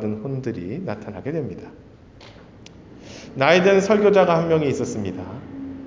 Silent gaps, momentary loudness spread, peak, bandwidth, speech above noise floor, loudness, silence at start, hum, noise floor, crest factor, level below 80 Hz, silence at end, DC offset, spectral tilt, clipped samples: none; 19 LU; -2 dBFS; 7.6 kHz; 25 dB; -20 LUFS; 0 s; none; -45 dBFS; 20 dB; -50 dBFS; 0 s; under 0.1%; -6 dB/octave; under 0.1%